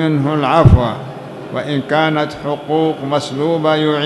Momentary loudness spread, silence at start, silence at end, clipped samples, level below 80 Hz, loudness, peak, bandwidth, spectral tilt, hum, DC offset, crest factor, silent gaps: 13 LU; 0 s; 0 s; 0.5%; -28 dBFS; -15 LUFS; 0 dBFS; 12 kHz; -7 dB/octave; none; under 0.1%; 14 dB; none